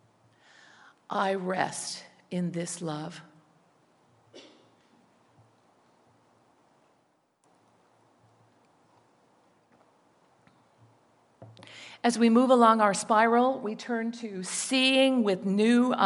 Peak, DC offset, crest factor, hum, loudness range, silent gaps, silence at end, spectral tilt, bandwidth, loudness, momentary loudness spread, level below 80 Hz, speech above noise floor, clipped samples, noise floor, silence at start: -6 dBFS; under 0.1%; 22 dB; none; 15 LU; none; 0 s; -4 dB/octave; 11.5 kHz; -26 LUFS; 17 LU; -84 dBFS; 45 dB; under 0.1%; -70 dBFS; 1.1 s